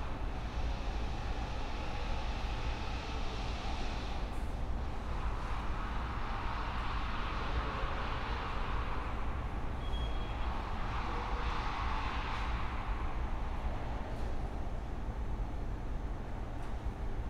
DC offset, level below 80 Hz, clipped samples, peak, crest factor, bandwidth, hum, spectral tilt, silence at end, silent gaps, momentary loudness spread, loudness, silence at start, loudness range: under 0.1%; -38 dBFS; under 0.1%; -22 dBFS; 14 dB; 10 kHz; none; -6 dB/octave; 0 s; none; 4 LU; -40 LUFS; 0 s; 3 LU